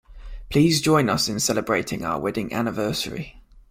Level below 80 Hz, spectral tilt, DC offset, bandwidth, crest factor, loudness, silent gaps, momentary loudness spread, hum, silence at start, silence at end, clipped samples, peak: -44 dBFS; -4.5 dB/octave; under 0.1%; 16.5 kHz; 18 dB; -22 LUFS; none; 9 LU; none; 0.1 s; 0.1 s; under 0.1%; -4 dBFS